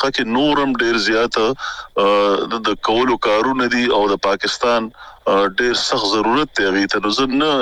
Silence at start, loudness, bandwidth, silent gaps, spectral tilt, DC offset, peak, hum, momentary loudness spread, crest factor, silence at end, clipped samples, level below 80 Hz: 0 s; -17 LUFS; 11.5 kHz; none; -3.5 dB/octave; under 0.1%; -4 dBFS; none; 4 LU; 14 dB; 0 s; under 0.1%; -46 dBFS